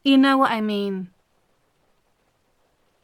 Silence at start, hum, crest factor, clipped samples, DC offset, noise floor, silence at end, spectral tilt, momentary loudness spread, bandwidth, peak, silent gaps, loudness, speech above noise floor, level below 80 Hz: 0.05 s; none; 16 dB; under 0.1%; under 0.1%; -66 dBFS; 2 s; -5.5 dB/octave; 17 LU; 12 kHz; -6 dBFS; none; -20 LUFS; 47 dB; -72 dBFS